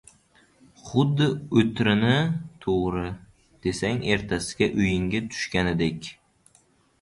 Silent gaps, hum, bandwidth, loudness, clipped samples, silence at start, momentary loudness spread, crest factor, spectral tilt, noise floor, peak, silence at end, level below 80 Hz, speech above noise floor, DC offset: none; none; 11.5 kHz; -25 LUFS; under 0.1%; 0.85 s; 10 LU; 20 dB; -6 dB/octave; -62 dBFS; -6 dBFS; 0.9 s; -46 dBFS; 38 dB; under 0.1%